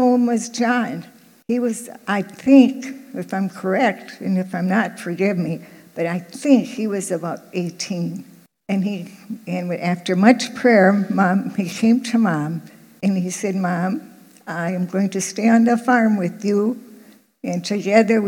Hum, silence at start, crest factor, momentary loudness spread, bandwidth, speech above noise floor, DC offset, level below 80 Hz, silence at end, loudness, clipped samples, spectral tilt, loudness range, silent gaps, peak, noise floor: none; 0 s; 20 dB; 14 LU; 16.5 kHz; 29 dB; under 0.1%; -74 dBFS; 0 s; -19 LUFS; under 0.1%; -6 dB/octave; 5 LU; none; 0 dBFS; -48 dBFS